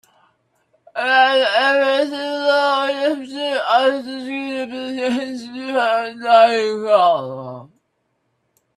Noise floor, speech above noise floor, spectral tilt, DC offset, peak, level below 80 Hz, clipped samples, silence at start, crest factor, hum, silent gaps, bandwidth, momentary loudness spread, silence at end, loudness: -69 dBFS; 52 dB; -3.5 dB/octave; under 0.1%; 0 dBFS; -72 dBFS; under 0.1%; 0.95 s; 18 dB; none; none; 12.5 kHz; 14 LU; 1.1 s; -17 LUFS